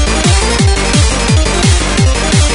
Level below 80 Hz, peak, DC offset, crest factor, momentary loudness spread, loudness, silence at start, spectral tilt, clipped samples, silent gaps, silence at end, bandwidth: -14 dBFS; 0 dBFS; under 0.1%; 10 dB; 1 LU; -10 LUFS; 0 s; -4 dB/octave; under 0.1%; none; 0 s; 11 kHz